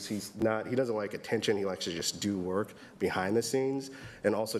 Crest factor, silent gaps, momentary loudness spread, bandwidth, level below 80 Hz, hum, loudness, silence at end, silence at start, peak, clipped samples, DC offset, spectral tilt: 18 dB; none; 6 LU; 15.5 kHz; -66 dBFS; none; -32 LUFS; 0 s; 0 s; -14 dBFS; under 0.1%; under 0.1%; -4.5 dB/octave